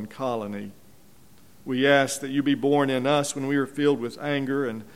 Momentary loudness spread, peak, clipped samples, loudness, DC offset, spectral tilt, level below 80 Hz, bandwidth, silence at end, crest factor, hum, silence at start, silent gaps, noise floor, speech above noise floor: 11 LU; -6 dBFS; under 0.1%; -24 LUFS; 0.3%; -4.5 dB/octave; -66 dBFS; 15.5 kHz; 0.05 s; 20 dB; none; 0 s; none; -55 dBFS; 31 dB